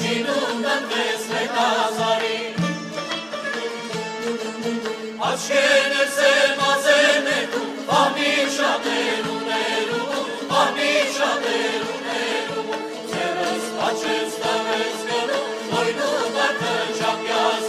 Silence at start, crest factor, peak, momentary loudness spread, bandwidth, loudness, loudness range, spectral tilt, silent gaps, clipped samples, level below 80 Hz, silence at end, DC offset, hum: 0 s; 18 dB; -4 dBFS; 10 LU; 14.5 kHz; -21 LUFS; 6 LU; -2.5 dB/octave; none; under 0.1%; -68 dBFS; 0 s; under 0.1%; none